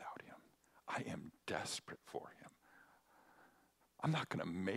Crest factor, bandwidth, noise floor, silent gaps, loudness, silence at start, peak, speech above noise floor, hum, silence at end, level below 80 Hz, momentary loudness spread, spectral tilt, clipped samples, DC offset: 22 dB; 15.5 kHz; -74 dBFS; none; -45 LUFS; 0 s; -24 dBFS; 31 dB; none; 0 s; -80 dBFS; 22 LU; -5 dB/octave; under 0.1%; under 0.1%